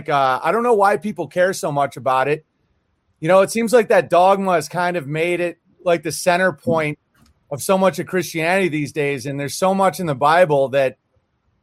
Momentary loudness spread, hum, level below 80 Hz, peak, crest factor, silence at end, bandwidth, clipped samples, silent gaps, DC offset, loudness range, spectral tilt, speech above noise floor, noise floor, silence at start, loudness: 10 LU; none; -64 dBFS; -2 dBFS; 16 dB; 0.7 s; 16 kHz; under 0.1%; none; under 0.1%; 3 LU; -5 dB/octave; 48 dB; -66 dBFS; 0 s; -18 LUFS